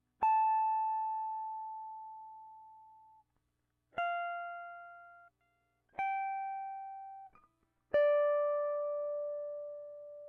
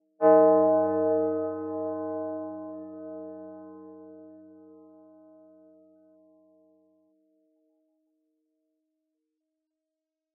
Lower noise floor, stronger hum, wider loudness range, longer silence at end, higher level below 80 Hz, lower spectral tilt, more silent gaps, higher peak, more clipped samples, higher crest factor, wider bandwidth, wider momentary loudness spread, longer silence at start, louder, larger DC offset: second, -82 dBFS vs -87 dBFS; first, 60 Hz at -85 dBFS vs none; second, 9 LU vs 27 LU; second, 0 s vs 6 s; first, -80 dBFS vs under -90 dBFS; second, -0.5 dB/octave vs -3 dB/octave; neither; second, -22 dBFS vs -8 dBFS; neither; second, 16 dB vs 22 dB; first, 4.3 kHz vs 2.7 kHz; second, 21 LU vs 27 LU; about the same, 0.2 s vs 0.2 s; second, -35 LUFS vs -25 LUFS; neither